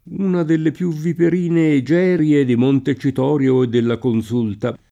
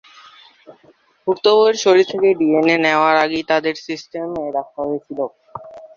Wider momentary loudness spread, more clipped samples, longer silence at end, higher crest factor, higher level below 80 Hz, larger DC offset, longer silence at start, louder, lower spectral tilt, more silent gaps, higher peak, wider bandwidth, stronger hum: second, 6 LU vs 14 LU; neither; about the same, 0.15 s vs 0.1 s; about the same, 12 dB vs 16 dB; first, -56 dBFS vs -62 dBFS; neither; second, 0.05 s vs 0.7 s; about the same, -17 LUFS vs -17 LUFS; first, -8.5 dB/octave vs -4 dB/octave; neither; about the same, -4 dBFS vs -2 dBFS; first, 10.5 kHz vs 7.4 kHz; neither